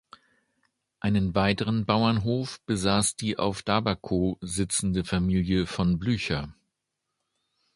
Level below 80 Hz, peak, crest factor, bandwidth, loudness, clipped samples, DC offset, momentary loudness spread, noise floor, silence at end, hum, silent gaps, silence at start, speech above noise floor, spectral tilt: -46 dBFS; -6 dBFS; 22 dB; 11.5 kHz; -26 LUFS; under 0.1%; under 0.1%; 7 LU; -83 dBFS; 1.25 s; none; none; 1.05 s; 57 dB; -5 dB/octave